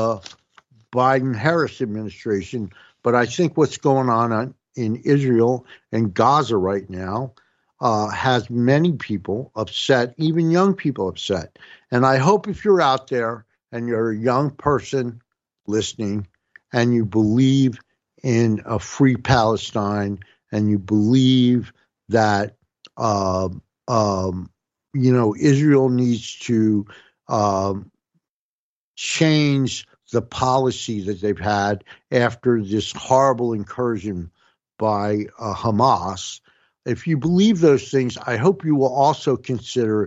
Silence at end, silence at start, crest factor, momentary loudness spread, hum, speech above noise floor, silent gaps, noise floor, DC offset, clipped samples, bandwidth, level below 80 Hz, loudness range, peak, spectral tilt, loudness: 0 s; 0 s; 16 dB; 12 LU; none; over 71 dB; 28.29-28.94 s; under -90 dBFS; under 0.1%; under 0.1%; 8.2 kHz; -56 dBFS; 3 LU; -2 dBFS; -6 dB/octave; -20 LUFS